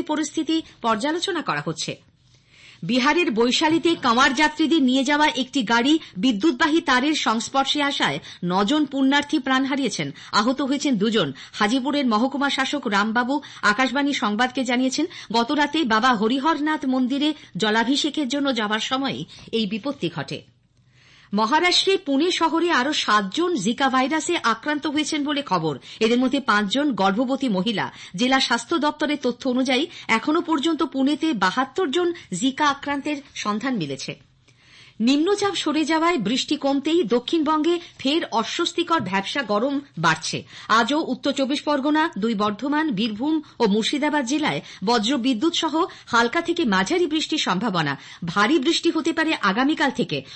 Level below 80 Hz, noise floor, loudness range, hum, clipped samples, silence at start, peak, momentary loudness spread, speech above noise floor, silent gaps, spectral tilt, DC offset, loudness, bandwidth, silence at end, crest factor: -60 dBFS; -58 dBFS; 4 LU; none; under 0.1%; 0 s; -6 dBFS; 7 LU; 36 dB; none; -4 dB/octave; under 0.1%; -21 LUFS; 8.8 kHz; 0 s; 14 dB